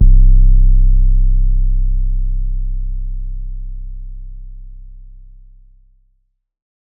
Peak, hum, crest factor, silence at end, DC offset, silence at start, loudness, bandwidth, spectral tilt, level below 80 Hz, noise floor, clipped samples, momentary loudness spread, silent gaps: 0 dBFS; none; 12 dB; 1.85 s; under 0.1%; 0 s; -18 LUFS; 0.4 kHz; -21 dB/octave; -12 dBFS; -62 dBFS; under 0.1%; 23 LU; none